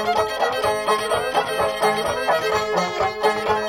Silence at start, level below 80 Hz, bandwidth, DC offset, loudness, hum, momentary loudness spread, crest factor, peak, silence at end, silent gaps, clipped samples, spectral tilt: 0 s; -48 dBFS; 17 kHz; under 0.1%; -21 LUFS; none; 2 LU; 14 dB; -6 dBFS; 0 s; none; under 0.1%; -3 dB/octave